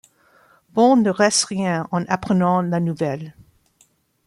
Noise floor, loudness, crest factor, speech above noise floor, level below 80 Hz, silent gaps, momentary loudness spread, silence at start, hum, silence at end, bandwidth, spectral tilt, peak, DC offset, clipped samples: -60 dBFS; -19 LUFS; 18 dB; 42 dB; -58 dBFS; none; 10 LU; 0.75 s; none; 0.95 s; 12 kHz; -5 dB/octave; -4 dBFS; under 0.1%; under 0.1%